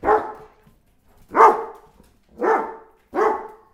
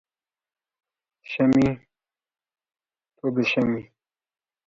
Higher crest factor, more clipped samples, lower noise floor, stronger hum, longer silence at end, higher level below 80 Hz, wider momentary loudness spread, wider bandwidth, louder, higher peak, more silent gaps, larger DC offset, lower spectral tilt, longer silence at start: about the same, 22 dB vs 18 dB; neither; second, -56 dBFS vs -89 dBFS; neither; second, 0.25 s vs 0.85 s; about the same, -54 dBFS vs -56 dBFS; first, 19 LU vs 14 LU; first, 13 kHz vs 7.4 kHz; first, -19 LUFS vs -23 LUFS; first, 0 dBFS vs -8 dBFS; neither; neither; second, -5.5 dB/octave vs -7 dB/octave; second, 0.05 s vs 1.3 s